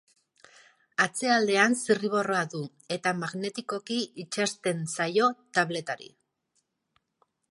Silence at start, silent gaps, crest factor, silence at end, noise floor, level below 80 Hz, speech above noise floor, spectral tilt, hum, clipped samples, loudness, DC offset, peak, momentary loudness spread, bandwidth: 1 s; none; 22 dB; 1.45 s; -76 dBFS; -80 dBFS; 48 dB; -3.5 dB/octave; none; under 0.1%; -28 LUFS; under 0.1%; -6 dBFS; 11 LU; 11.5 kHz